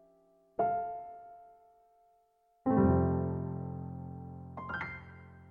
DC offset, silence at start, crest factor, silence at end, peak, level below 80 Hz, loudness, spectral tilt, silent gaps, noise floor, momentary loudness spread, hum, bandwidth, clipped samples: under 0.1%; 0.6 s; 20 dB; 0 s; -16 dBFS; -60 dBFS; -34 LUFS; -11 dB/octave; none; -71 dBFS; 22 LU; none; 5 kHz; under 0.1%